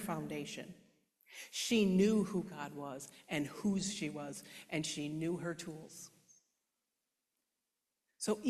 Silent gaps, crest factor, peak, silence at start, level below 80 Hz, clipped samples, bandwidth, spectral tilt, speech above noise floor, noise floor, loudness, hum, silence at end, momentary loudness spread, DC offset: none; 20 dB; -20 dBFS; 0 s; -72 dBFS; under 0.1%; 14 kHz; -5 dB/octave; 51 dB; -89 dBFS; -38 LUFS; none; 0 s; 19 LU; under 0.1%